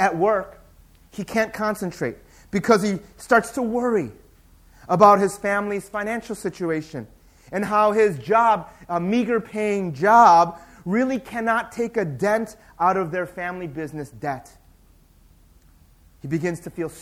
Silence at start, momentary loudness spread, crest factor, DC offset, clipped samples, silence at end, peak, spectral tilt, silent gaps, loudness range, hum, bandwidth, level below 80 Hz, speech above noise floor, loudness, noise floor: 0 s; 16 LU; 22 dB; under 0.1%; under 0.1%; 0 s; -2 dBFS; -6 dB/octave; none; 9 LU; none; 16 kHz; -54 dBFS; 33 dB; -21 LUFS; -54 dBFS